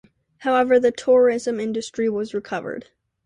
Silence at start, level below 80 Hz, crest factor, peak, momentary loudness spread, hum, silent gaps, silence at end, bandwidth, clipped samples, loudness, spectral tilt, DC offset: 0.4 s; -64 dBFS; 14 dB; -6 dBFS; 12 LU; none; none; 0.4 s; 10 kHz; under 0.1%; -21 LUFS; -5 dB/octave; under 0.1%